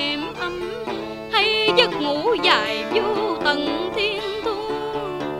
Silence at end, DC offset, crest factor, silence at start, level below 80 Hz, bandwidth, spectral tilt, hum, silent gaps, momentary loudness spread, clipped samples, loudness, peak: 0 s; under 0.1%; 22 dB; 0 s; -52 dBFS; 16 kHz; -4 dB/octave; none; none; 11 LU; under 0.1%; -21 LUFS; 0 dBFS